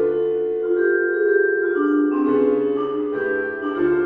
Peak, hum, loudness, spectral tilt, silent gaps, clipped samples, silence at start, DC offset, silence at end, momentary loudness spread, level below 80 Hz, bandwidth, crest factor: -6 dBFS; none; -20 LUFS; -9 dB/octave; none; under 0.1%; 0 s; under 0.1%; 0 s; 5 LU; -58 dBFS; 4 kHz; 12 dB